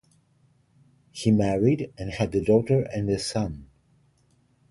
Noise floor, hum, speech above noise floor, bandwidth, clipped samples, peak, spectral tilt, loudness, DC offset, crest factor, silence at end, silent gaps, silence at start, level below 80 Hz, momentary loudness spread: -64 dBFS; none; 41 dB; 11.5 kHz; under 0.1%; -6 dBFS; -7 dB/octave; -25 LUFS; under 0.1%; 20 dB; 1.05 s; none; 1.15 s; -48 dBFS; 12 LU